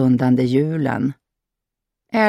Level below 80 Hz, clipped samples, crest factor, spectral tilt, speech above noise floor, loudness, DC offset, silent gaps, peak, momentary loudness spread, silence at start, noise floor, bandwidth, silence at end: -60 dBFS; under 0.1%; 14 dB; -8.5 dB/octave; 66 dB; -19 LUFS; under 0.1%; none; -4 dBFS; 8 LU; 0 s; -83 dBFS; 9 kHz; 0 s